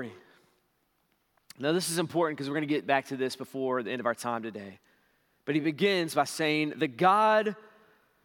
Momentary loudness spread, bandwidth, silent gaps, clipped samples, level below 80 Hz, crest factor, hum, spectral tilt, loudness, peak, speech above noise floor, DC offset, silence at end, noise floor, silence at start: 12 LU; 18 kHz; none; under 0.1%; -84 dBFS; 20 dB; none; -4.5 dB/octave; -28 LUFS; -10 dBFS; 45 dB; under 0.1%; 0.6 s; -73 dBFS; 0 s